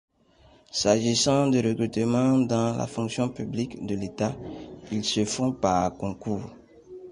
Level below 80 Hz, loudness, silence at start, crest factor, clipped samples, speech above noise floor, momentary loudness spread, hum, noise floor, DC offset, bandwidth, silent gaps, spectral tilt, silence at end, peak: -54 dBFS; -26 LUFS; 0.75 s; 20 dB; under 0.1%; 32 dB; 12 LU; none; -58 dBFS; under 0.1%; 11.5 kHz; none; -5 dB/octave; 0 s; -6 dBFS